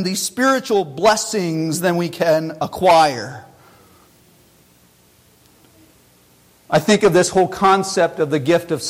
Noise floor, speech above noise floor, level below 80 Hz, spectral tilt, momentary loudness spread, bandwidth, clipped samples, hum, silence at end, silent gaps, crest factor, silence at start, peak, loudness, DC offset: -53 dBFS; 36 dB; -54 dBFS; -4.5 dB/octave; 7 LU; 16.5 kHz; under 0.1%; none; 0 s; none; 14 dB; 0 s; -4 dBFS; -17 LUFS; under 0.1%